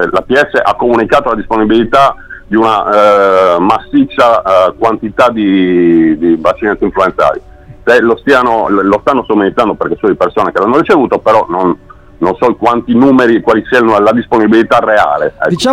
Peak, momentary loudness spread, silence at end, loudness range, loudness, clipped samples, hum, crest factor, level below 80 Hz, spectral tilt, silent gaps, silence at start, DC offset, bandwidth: 0 dBFS; 5 LU; 0 s; 2 LU; -9 LUFS; under 0.1%; none; 8 dB; -38 dBFS; -6 dB/octave; none; 0 s; 0.2%; 12 kHz